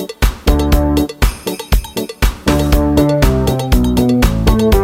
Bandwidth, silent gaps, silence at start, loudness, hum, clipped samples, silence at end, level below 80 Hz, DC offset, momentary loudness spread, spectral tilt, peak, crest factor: 17 kHz; none; 0 s; -14 LUFS; none; under 0.1%; 0 s; -16 dBFS; under 0.1%; 6 LU; -6 dB/octave; 0 dBFS; 12 dB